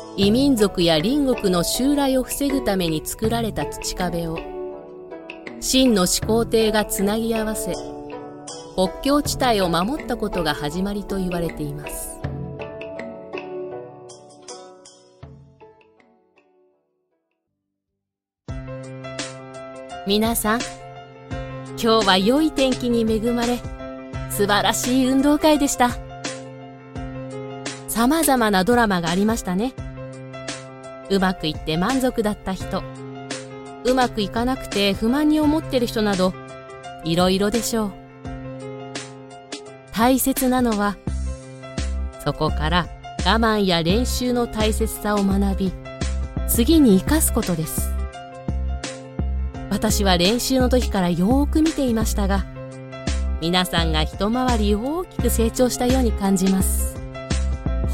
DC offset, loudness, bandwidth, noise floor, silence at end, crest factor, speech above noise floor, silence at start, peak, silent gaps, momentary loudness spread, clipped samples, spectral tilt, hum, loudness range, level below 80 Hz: under 0.1%; -21 LUFS; 17 kHz; -83 dBFS; 0 s; 20 dB; 64 dB; 0 s; -2 dBFS; none; 17 LU; under 0.1%; -4.5 dB/octave; none; 7 LU; -32 dBFS